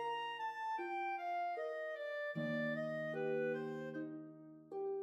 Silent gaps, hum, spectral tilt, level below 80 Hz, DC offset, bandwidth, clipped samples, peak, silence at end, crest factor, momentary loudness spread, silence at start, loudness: none; none; -6.5 dB/octave; under -90 dBFS; under 0.1%; 13.5 kHz; under 0.1%; -28 dBFS; 0 s; 14 dB; 8 LU; 0 s; -42 LUFS